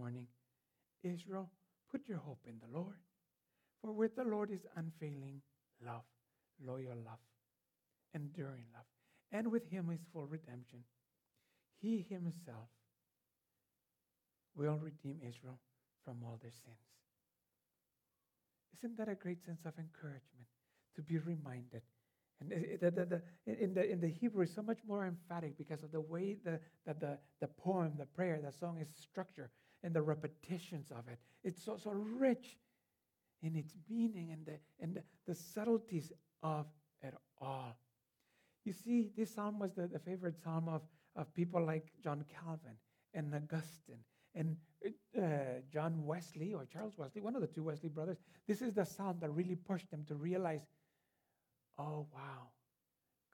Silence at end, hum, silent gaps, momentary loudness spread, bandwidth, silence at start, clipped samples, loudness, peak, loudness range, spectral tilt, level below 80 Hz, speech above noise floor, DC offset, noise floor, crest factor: 0.85 s; none; none; 17 LU; 18 kHz; 0 s; under 0.1%; -44 LUFS; -22 dBFS; 9 LU; -8 dB/octave; under -90 dBFS; 47 dB; under 0.1%; -90 dBFS; 22 dB